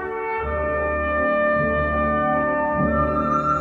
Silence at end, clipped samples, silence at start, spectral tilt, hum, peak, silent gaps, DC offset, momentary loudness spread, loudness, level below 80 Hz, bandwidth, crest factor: 0 s; under 0.1%; 0 s; -8.5 dB/octave; none; -10 dBFS; none; under 0.1%; 4 LU; -21 LUFS; -34 dBFS; 7.2 kHz; 12 dB